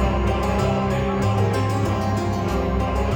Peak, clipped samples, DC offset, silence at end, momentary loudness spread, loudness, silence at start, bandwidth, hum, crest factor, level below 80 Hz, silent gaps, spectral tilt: -10 dBFS; under 0.1%; under 0.1%; 0 s; 2 LU; -22 LUFS; 0 s; 17.5 kHz; none; 12 dB; -28 dBFS; none; -7 dB/octave